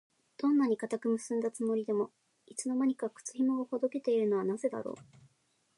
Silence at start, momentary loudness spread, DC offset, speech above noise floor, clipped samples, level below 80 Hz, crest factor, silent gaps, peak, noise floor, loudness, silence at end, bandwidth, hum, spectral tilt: 0.4 s; 10 LU; under 0.1%; 42 dB; under 0.1%; -84 dBFS; 14 dB; none; -20 dBFS; -74 dBFS; -33 LUFS; 0.75 s; 11.5 kHz; none; -5.5 dB/octave